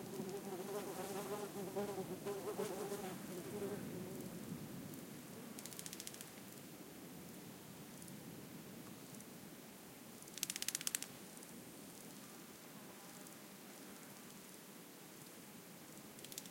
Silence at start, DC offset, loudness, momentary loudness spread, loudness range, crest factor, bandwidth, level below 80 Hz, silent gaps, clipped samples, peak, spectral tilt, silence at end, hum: 0 s; under 0.1%; -49 LUFS; 11 LU; 9 LU; 36 dB; 17 kHz; -82 dBFS; none; under 0.1%; -14 dBFS; -3.5 dB/octave; 0 s; none